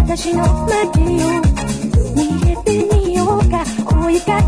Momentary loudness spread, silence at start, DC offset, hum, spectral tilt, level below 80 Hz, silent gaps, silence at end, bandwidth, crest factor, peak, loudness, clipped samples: 2 LU; 0 s; under 0.1%; none; -6.5 dB/octave; -20 dBFS; none; 0 s; 11 kHz; 12 dB; -2 dBFS; -16 LUFS; under 0.1%